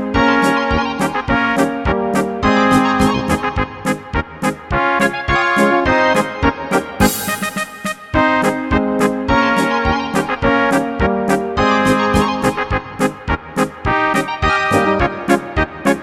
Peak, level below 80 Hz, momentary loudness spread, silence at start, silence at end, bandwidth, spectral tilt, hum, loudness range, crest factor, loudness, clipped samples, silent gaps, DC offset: 0 dBFS; -30 dBFS; 7 LU; 0 s; 0 s; 18 kHz; -5 dB/octave; none; 1 LU; 16 dB; -16 LUFS; under 0.1%; none; under 0.1%